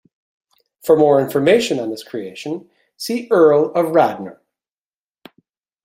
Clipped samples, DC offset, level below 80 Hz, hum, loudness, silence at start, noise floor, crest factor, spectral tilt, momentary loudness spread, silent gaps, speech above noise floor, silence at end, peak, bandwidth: under 0.1%; under 0.1%; -64 dBFS; none; -16 LUFS; 0.85 s; under -90 dBFS; 16 dB; -5.5 dB/octave; 17 LU; none; over 74 dB; 1.5 s; -2 dBFS; 16 kHz